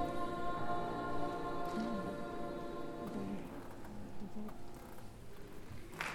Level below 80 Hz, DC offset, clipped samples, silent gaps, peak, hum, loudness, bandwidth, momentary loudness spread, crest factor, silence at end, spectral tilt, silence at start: -56 dBFS; under 0.1%; under 0.1%; none; -24 dBFS; none; -43 LUFS; 18 kHz; 13 LU; 16 dB; 0 s; -6 dB/octave; 0 s